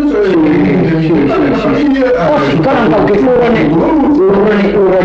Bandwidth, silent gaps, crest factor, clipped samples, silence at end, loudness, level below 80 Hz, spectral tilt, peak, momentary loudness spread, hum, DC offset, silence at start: 7.4 kHz; none; 6 dB; under 0.1%; 0 s; -9 LUFS; -32 dBFS; -8.5 dB/octave; -2 dBFS; 2 LU; none; under 0.1%; 0 s